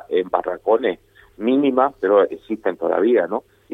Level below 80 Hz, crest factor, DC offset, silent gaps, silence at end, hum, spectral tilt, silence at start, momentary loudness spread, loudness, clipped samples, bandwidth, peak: -60 dBFS; 18 dB; under 0.1%; none; 0 s; none; -7.5 dB/octave; 0.1 s; 9 LU; -20 LUFS; under 0.1%; 4 kHz; -2 dBFS